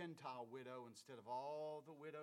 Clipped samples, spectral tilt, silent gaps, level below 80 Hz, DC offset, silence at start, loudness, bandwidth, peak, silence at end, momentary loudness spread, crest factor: under 0.1%; -5.5 dB/octave; none; under -90 dBFS; under 0.1%; 0 s; -53 LUFS; 16.5 kHz; -38 dBFS; 0 s; 8 LU; 16 dB